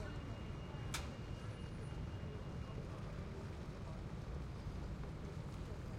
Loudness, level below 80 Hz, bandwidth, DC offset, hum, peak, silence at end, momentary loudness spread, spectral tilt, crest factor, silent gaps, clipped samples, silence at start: -48 LUFS; -52 dBFS; 16 kHz; under 0.1%; none; -30 dBFS; 0 s; 3 LU; -6 dB/octave; 16 dB; none; under 0.1%; 0 s